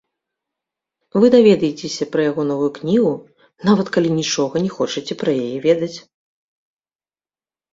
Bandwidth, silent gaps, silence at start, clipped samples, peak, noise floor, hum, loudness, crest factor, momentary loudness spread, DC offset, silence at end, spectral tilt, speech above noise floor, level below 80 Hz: 7.8 kHz; none; 1.15 s; under 0.1%; -2 dBFS; under -90 dBFS; none; -18 LUFS; 18 dB; 10 LU; under 0.1%; 1.75 s; -5.5 dB/octave; over 73 dB; -60 dBFS